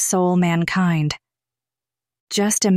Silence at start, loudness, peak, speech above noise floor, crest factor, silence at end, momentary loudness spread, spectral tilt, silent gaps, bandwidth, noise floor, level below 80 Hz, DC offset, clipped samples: 0 s; -19 LUFS; -6 dBFS; 72 dB; 14 dB; 0 s; 8 LU; -4.5 dB/octave; 2.20-2.27 s; 15 kHz; -90 dBFS; -56 dBFS; under 0.1%; under 0.1%